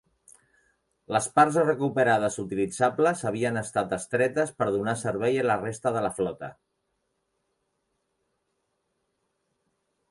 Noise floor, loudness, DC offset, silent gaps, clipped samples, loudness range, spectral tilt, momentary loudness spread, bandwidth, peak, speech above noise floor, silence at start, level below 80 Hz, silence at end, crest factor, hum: -77 dBFS; -26 LUFS; under 0.1%; none; under 0.1%; 9 LU; -5 dB/octave; 8 LU; 11.5 kHz; -6 dBFS; 52 dB; 1.1 s; -64 dBFS; 3.6 s; 22 dB; none